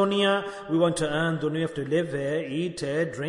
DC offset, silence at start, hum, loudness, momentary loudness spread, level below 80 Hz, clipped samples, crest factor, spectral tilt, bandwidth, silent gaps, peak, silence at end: under 0.1%; 0 s; none; -26 LUFS; 5 LU; -60 dBFS; under 0.1%; 16 dB; -5.5 dB/octave; 11 kHz; none; -10 dBFS; 0 s